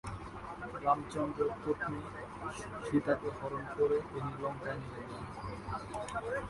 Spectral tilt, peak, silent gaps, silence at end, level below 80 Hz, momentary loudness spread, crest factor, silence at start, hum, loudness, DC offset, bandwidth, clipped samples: -6.5 dB/octave; -16 dBFS; none; 0 s; -56 dBFS; 12 LU; 22 dB; 0.05 s; none; -37 LUFS; under 0.1%; 11.5 kHz; under 0.1%